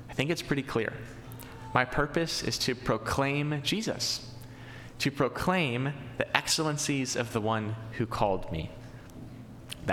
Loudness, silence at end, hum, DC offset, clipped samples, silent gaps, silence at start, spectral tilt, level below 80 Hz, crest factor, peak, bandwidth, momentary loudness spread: -30 LUFS; 0 s; none; under 0.1%; under 0.1%; none; 0 s; -4 dB/octave; -50 dBFS; 28 dB; -4 dBFS; 17.5 kHz; 18 LU